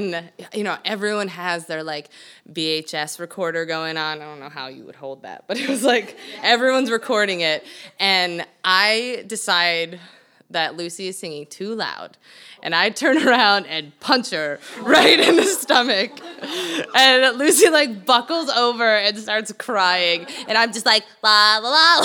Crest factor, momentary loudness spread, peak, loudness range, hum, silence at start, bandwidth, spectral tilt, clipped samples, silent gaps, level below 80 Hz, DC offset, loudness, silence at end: 18 dB; 18 LU; 0 dBFS; 10 LU; none; 0 s; over 20 kHz; -2 dB/octave; under 0.1%; none; -74 dBFS; under 0.1%; -18 LUFS; 0 s